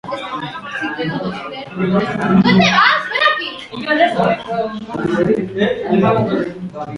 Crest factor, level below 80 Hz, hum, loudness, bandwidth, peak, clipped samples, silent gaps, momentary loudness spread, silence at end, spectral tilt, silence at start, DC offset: 16 dB; -48 dBFS; none; -16 LUFS; 10.5 kHz; 0 dBFS; under 0.1%; none; 14 LU; 0 s; -6 dB/octave; 0.05 s; under 0.1%